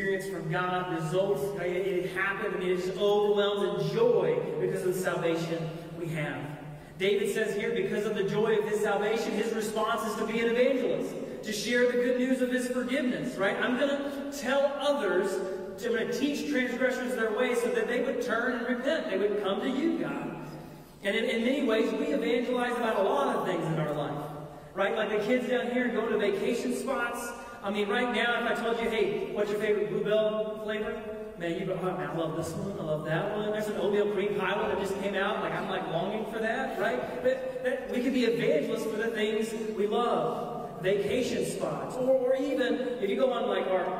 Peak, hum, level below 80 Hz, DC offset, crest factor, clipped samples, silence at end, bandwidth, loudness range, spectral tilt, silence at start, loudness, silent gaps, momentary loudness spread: -14 dBFS; none; -60 dBFS; under 0.1%; 14 dB; under 0.1%; 0 s; 16 kHz; 3 LU; -5 dB/octave; 0 s; -29 LUFS; none; 7 LU